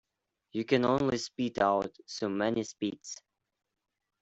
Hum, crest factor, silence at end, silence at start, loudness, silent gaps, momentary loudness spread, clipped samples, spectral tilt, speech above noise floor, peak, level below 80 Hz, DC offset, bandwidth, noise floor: none; 20 dB; 1.05 s; 0.55 s; -31 LUFS; none; 13 LU; under 0.1%; -5 dB/octave; 52 dB; -12 dBFS; -66 dBFS; under 0.1%; 8.2 kHz; -82 dBFS